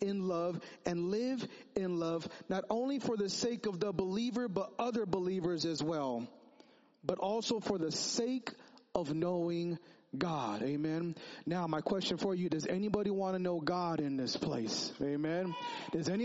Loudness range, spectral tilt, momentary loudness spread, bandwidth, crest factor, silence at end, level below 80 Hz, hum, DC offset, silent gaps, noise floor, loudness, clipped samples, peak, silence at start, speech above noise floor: 2 LU; -5 dB/octave; 6 LU; 7.6 kHz; 22 dB; 0 s; -70 dBFS; none; under 0.1%; none; -64 dBFS; -36 LUFS; under 0.1%; -14 dBFS; 0 s; 28 dB